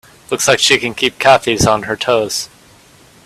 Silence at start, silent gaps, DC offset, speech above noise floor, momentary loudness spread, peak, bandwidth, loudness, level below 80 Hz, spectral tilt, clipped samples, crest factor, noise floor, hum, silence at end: 0.3 s; none; under 0.1%; 31 dB; 10 LU; 0 dBFS; 16 kHz; -13 LUFS; -44 dBFS; -2.5 dB/octave; under 0.1%; 16 dB; -45 dBFS; none; 0.8 s